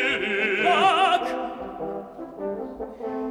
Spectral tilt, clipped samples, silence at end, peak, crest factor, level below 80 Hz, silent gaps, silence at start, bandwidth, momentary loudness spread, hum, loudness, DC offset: -3.5 dB/octave; under 0.1%; 0 s; -8 dBFS; 16 dB; -58 dBFS; none; 0 s; 13.5 kHz; 16 LU; none; -24 LUFS; under 0.1%